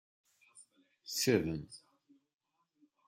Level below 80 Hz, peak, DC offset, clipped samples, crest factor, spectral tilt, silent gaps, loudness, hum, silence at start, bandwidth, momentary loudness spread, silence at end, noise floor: -68 dBFS; -16 dBFS; under 0.1%; under 0.1%; 24 dB; -4 dB/octave; none; -34 LUFS; none; 0.55 s; 16 kHz; 23 LU; 1.3 s; -74 dBFS